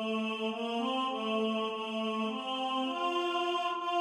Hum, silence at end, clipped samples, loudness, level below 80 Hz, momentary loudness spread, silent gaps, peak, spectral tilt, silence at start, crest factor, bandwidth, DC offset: none; 0 s; under 0.1%; -33 LUFS; -84 dBFS; 3 LU; none; -20 dBFS; -4.5 dB/octave; 0 s; 12 dB; 12 kHz; under 0.1%